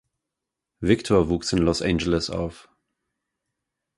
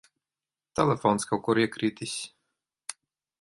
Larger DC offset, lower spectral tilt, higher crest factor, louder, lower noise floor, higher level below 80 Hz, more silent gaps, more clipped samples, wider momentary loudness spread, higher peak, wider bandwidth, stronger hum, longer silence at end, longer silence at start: neither; about the same, -5.5 dB/octave vs -5 dB/octave; about the same, 22 dB vs 22 dB; first, -23 LUFS vs -27 LUFS; second, -85 dBFS vs under -90 dBFS; first, -42 dBFS vs -64 dBFS; neither; neither; second, 10 LU vs 17 LU; about the same, -4 dBFS vs -6 dBFS; about the same, 11.5 kHz vs 11.5 kHz; neither; first, 1.4 s vs 0.5 s; about the same, 0.8 s vs 0.75 s